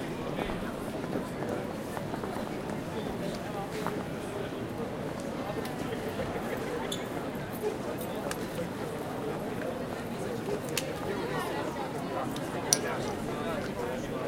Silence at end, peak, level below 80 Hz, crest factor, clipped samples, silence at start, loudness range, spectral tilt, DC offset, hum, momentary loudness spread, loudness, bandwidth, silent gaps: 0 s; -2 dBFS; -54 dBFS; 32 dB; under 0.1%; 0 s; 3 LU; -4.5 dB/octave; under 0.1%; none; 3 LU; -34 LUFS; 16.5 kHz; none